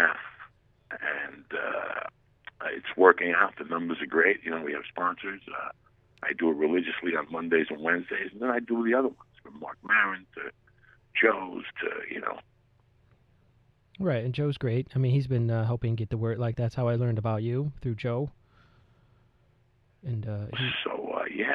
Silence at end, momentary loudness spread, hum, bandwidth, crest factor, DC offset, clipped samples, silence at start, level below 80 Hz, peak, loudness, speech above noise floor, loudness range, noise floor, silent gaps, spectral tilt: 0 s; 13 LU; none; 5.4 kHz; 28 dB; under 0.1%; under 0.1%; 0 s; -60 dBFS; -2 dBFS; -28 LUFS; 37 dB; 8 LU; -65 dBFS; none; -8.5 dB/octave